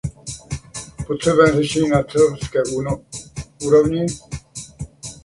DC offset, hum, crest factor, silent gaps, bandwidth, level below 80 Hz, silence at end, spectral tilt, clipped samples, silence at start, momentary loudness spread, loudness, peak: under 0.1%; none; 18 dB; none; 11.5 kHz; -42 dBFS; 0.05 s; -5.5 dB/octave; under 0.1%; 0.05 s; 18 LU; -18 LUFS; -2 dBFS